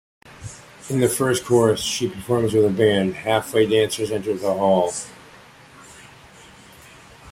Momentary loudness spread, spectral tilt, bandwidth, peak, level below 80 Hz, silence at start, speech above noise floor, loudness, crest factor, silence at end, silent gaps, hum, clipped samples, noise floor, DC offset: 20 LU; -5 dB/octave; 16 kHz; -4 dBFS; -54 dBFS; 0.3 s; 27 dB; -20 LUFS; 18 dB; 0 s; none; none; under 0.1%; -46 dBFS; under 0.1%